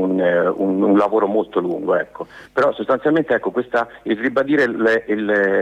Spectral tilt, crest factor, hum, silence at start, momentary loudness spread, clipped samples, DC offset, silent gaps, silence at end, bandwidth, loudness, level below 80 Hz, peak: -7.5 dB/octave; 12 dB; none; 0 s; 6 LU; under 0.1%; under 0.1%; none; 0 s; 8.4 kHz; -18 LUFS; -58 dBFS; -6 dBFS